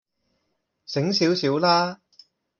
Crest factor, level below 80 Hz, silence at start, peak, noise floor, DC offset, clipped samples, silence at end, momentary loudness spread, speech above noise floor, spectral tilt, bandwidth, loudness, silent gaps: 20 dB; -68 dBFS; 0.9 s; -6 dBFS; -75 dBFS; under 0.1%; under 0.1%; 0.65 s; 9 LU; 54 dB; -5 dB/octave; 7.2 kHz; -22 LUFS; none